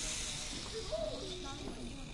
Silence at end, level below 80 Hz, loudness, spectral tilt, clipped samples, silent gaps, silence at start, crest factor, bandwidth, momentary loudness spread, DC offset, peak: 0 s; -50 dBFS; -41 LUFS; -2.5 dB/octave; under 0.1%; none; 0 s; 16 dB; 11.5 kHz; 7 LU; under 0.1%; -26 dBFS